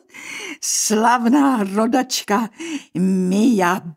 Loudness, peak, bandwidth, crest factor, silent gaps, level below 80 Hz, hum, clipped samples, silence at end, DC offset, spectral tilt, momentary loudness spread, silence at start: -18 LUFS; -2 dBFS; 16 kHz; 16 dB; none; -70 dBFS; none; under 0.1%; 0.05 s; under 0.1%; -4 dB/octave; 13 LU; 0.15 s